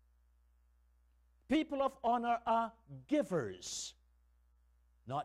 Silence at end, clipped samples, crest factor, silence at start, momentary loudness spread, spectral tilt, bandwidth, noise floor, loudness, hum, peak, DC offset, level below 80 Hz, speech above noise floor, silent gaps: 0 s; under 0.1%; 16 dB; 1.5 s; 9 LU; -4.5 dB/octave; 14.5 kHz; -70 dBFS; -36 LUFS; 60 Hz at -65 dBFS; -22 dBFS; under 0.1%; -68 dBFS; 34 dB; none